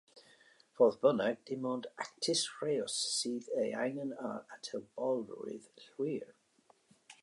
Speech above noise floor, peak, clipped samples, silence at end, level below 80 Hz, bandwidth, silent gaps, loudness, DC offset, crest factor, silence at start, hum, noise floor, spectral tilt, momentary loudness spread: 34 dB; -16 dBFS; under 0.1%; 0.1 s; -84 dBFS; 11.5 kHz; none; -35 LUFS; under 0.1%; 22 dB; 0.15 s; none; -70 dBFS; -3.5 dB/octave; 14 LU